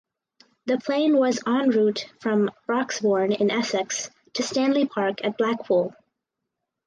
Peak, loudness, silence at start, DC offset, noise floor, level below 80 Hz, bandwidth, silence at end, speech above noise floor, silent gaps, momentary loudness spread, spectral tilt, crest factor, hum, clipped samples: -10 dBFS; -24 LUFS; 0.65 s; under 0.1%; -83 dBFS; -74 dBFS; 10 kHz; 0.95 s; 60 dB; none; 8 LU; -4.5 dB/octave; 14 dB; none; under 0.1%